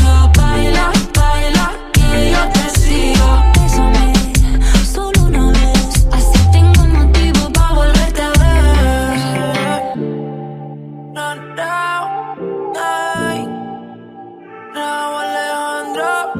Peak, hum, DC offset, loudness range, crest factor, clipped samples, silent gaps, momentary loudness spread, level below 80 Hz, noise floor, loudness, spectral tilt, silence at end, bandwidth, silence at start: 0 dBFS; none; under 0.1%; 9 LU; 12 dB; under 0.1%; none; 14 LU; -14 dBFS; -34 dBFS; -14 LUFS; -5 dB/octave; 0 s; 15.5 kHz; 0 s